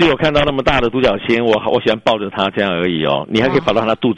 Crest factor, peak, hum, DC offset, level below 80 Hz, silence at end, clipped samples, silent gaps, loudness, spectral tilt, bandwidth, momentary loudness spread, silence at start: 14 dB; 0 dBFS; none; under 0.1%; -34 dBFS; 0 s; under 0.1%; none; -15 LUFS; -6 dB/octave; 9.4 kHz; 3 LU; 0 s